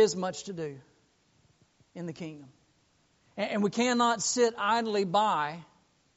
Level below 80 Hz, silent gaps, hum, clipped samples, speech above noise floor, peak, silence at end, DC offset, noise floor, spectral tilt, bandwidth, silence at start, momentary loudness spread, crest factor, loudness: -72 dBFS; none; none; under 0.1%; 40 dB; -12 dBFS; 0.55 s; under 0.1%; -69 dBFS; -3 dB/octave; 8 kHz; 0 s; 17 LU; 18 dB; -29 LUFS